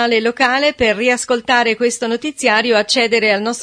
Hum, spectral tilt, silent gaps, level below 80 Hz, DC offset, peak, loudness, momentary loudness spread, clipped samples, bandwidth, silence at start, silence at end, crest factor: none; -2.5 dB/octave; none; -50 dBFS; under 0.1%; 0 dBFS; -14 LUFS; 4 LU; under 0.1%; 11 kHz; 0 s; 0 s; 16 dB